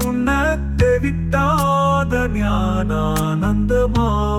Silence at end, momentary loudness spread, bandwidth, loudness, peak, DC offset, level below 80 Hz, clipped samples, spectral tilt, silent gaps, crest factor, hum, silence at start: 0 s; 3 LU; 18 kHz; -18 LUFS; -4 dBFS; under 0.1%; -26 dBFS; under 0.1%; -6.5 dB/octave; none; 12 dB; none; 0 s